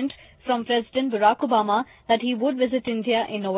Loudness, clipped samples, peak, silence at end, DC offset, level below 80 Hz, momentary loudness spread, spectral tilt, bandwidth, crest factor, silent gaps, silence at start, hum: -23 LUFS; under 0.1%; -6 dBFS; 0 s; under 0.1%; -62 dBFS; 6 LU; -9 dB/octave; 4 kHz; 16 dB; none; 0 s; none